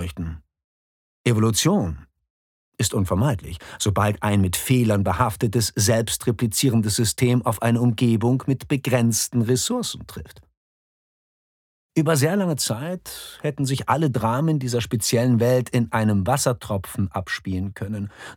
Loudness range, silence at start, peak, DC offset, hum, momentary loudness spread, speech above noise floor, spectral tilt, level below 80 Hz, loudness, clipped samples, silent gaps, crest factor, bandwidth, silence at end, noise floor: 5 LU; 0 s; -4 dBFS; under 0.1%; none; 11 LU; over 69 dB; -5 dB/octave; -48 dBFS; -22 LUFS; under 0.1%; 0.64-1.24 s, 2.30-2.72 s, 10.57-11.90 s; 18 dB; 18.5 kHz; 0 s; under -90 dBFS